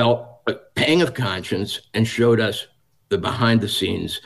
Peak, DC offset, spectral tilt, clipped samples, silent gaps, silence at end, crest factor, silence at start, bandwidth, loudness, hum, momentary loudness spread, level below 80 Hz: -6 dBFS; 0.1%; -5.5 dB/octave; under 0.1%; none; 0.05 s; 14 dB; 0 s; 12.5 kHz; -21 LUFS; none; 9 LU; -52 dBFS